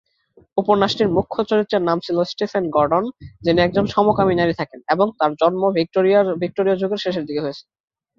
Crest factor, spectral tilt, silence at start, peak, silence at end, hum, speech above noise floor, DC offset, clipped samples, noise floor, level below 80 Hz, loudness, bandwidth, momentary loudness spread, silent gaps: 18 dB; -7 dB/octave; 0.55 s; -2 dBFS; 0.6 s; none; 37 dB; under 0.1%; under 0.1%; -55 dBFS; -50 dBFS; -19 LUFS; 7.4 kHz; 8 LU; none